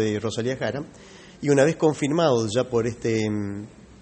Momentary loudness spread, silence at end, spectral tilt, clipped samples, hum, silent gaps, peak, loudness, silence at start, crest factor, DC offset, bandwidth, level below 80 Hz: 14 LU; 0.3 s; -5.5 dB/octave; under 0.1%; none; none; -6 dBFS; -23 LUFS; 0 s; 18 dB; under 0.1%; 8.8 kHz; -56 dBFS